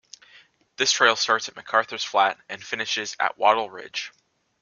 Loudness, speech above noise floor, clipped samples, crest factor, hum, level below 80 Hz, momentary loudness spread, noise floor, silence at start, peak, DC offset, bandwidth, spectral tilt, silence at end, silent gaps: -23 LUFS; 32 dB; under 0.1%; 24 dB; none; -74 dBFS; 14 LU; -55 dBFS; 0.8 s; -2 dBFS; under 0.1%; 10 kHz; -0.5 dB/octave; 0.5 s; none